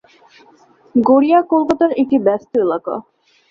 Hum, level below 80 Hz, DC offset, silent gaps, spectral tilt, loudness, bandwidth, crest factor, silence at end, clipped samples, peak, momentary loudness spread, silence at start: none; -60 dBFS; under 0.1%; none; -7.5 dB/octave; -15 LUFS; 7 kHz; 14 dB; 0.5 s; under 0.1%; -2 dBFS; 10 LU; 0.95 s